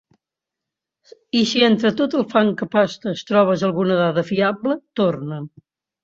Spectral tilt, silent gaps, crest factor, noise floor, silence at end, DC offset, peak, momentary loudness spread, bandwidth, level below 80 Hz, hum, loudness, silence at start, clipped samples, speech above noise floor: -6 dB/octave; none; 18 dB; -85 dBFS; 0.55 s; under 0.1%; -2 dBFS; 10 LU; 7.6 kHz; -62 dBFS; none; -19 LUFS; 1.35 s; under 0.1%; 66 dB